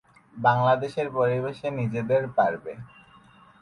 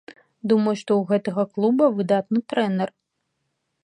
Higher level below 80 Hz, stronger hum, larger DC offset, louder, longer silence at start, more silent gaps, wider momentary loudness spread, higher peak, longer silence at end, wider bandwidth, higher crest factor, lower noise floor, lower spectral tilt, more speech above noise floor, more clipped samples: first, -62 dBFS vs -72 dBFS; neither; neither; second, -25 LUFS vs -22 LUFS; first, 0.35 s vs 0.1 s; neither; first, 11 LU vs 7 LU; about the same, -6 dBFS vs -6 dBFS; second, 0.75 s vs 0.95 s; first, 11 kHz vs 9.8 kHz; about the same, 20 dB vs 16 dB; second, -54 dBFS vs -76 dBFS; about the same, -8 dB/octave vs -7.5 dB/octave; second, 29 dB vs 55 dB; neither